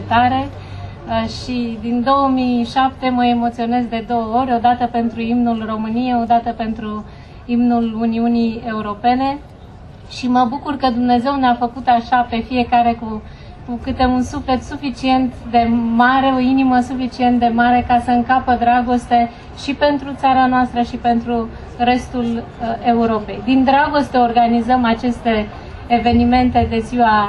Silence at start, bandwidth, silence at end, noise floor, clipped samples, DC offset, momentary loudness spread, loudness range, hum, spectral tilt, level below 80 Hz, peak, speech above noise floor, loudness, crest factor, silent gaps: 0 s; 10.5 kHz; 0 s; -37 dBFS; under 0.1%; under 0.1%; 10 LU; 4 LU; none; -6.5 dB/octave; -36 dBFS; 0 dBFS; 21 dB; -16 LUFS; 16 dB; none